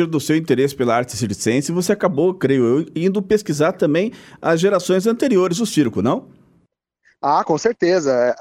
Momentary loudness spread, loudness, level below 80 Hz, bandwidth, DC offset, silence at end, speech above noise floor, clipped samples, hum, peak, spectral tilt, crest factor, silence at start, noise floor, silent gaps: 4 LU; -18 LUFS; -56 dBFS; 16 kHz; under 0.1%; 0 s; 45 dB; under 0.1%; none; -4 dBFS; -5.5 dB/octave; 14 dB; 0 s; -62 dBFS; none